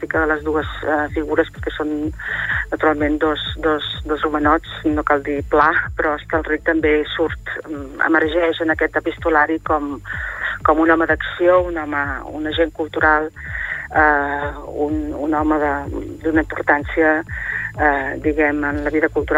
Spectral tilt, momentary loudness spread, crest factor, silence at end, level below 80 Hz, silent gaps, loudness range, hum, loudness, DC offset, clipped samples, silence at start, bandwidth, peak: -6.5 dB/octave; 9 LU; 16 dB; 0 s; -36 dBFS; none; 2 LU; none; -19 LUFS; under 0.1%; under 0.1%; 0 s; 10.5 kHz; -2 dBFS